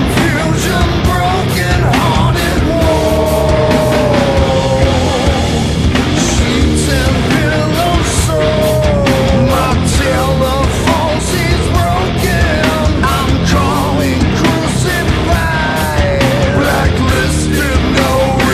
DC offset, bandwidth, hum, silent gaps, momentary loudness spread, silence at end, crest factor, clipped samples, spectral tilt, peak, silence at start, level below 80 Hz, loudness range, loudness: under 0.1%; 14.5 kHz; none; none; 2 LU; 0 s; 12 dB; under 0.1%; -5.5 dB/octave; 0 dBFS; 0 s; -20 dBFS; 1 LU; -12 LUFS